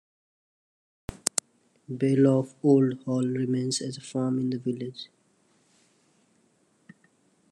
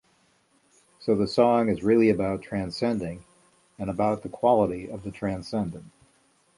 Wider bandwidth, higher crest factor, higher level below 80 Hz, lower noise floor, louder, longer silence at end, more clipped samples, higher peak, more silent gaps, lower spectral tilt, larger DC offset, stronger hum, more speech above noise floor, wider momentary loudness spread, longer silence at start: about the same, 12 kHz vs 11.5 kHz; first, 28 dB vs 20 dB; second, -62 dBFS vs -54 dBFS; about the same, -67 dBFS vs -65 dBFS; about the same, -26 LUFS vs -25 LUFS; first, 2.45 s vs 0.7 s; neither; first, 0 dBFS vs -6 dBFS; neither; second, -5.5 dB/octave vs -7 dB/octave; neither; neither; about the same, 41 dB vs 40 dB; first, 18 LU vs 14 LU; about the same, 1.1 s vs 1 s